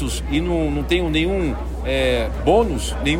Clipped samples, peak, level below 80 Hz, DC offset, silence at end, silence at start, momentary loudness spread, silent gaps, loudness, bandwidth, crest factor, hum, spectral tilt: under 0.1%; -4 dBFS; -26 dBFS; under 0.1%; 0 s; 0 s; 5 LU; none; -20 LUFS; 16 kHz; 16 dB; none; -5.5 dB/octave